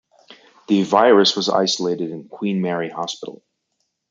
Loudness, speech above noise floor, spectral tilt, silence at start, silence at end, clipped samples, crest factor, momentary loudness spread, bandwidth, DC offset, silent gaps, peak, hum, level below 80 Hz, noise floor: -18 LUFS; 55 dB; -4.5 dB/octave; 0.3 s; 0.8 s; under 0.1%; 18 dB; 15 LU; 9 kHz; under 0.1%; none; -2 dBFS; none; -70 dBFS; -73 dBFS